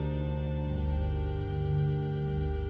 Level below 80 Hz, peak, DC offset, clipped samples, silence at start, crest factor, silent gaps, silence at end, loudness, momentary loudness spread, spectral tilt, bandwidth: -36 dBFS; -20 dBFS; under 0.1%; under 0.1%; 0 s; 10 dB; none; 0 s; -32 LUFS; 3 LU; -10.5 dB/octave; 4.5 kHz